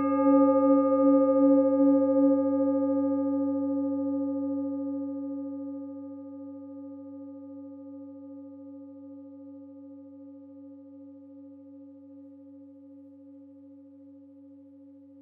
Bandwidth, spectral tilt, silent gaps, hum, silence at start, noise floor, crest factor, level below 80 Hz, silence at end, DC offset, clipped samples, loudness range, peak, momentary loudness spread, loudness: 2.8 kHz; -11 dB/octave; none; none; 0 s; -51 dBFS; 18 dB; under -90 dBFS; 1.1 s; under 0.1%; under 0.1%; 26 LU; -12 dBFS; 26 LU; -25 LUFS